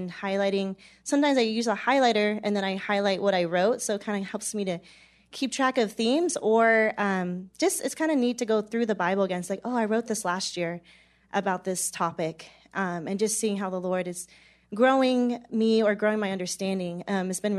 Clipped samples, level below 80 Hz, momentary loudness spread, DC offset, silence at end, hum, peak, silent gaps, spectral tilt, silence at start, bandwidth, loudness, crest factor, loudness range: under 0.1%; -70 dBFS; 10 LU; under 0.1%; 0 s; none; -10 dBFS; none; -4 dB/octave; 0 s; 13.5 kHz; -26 LUFS; 18 dB; 5 LU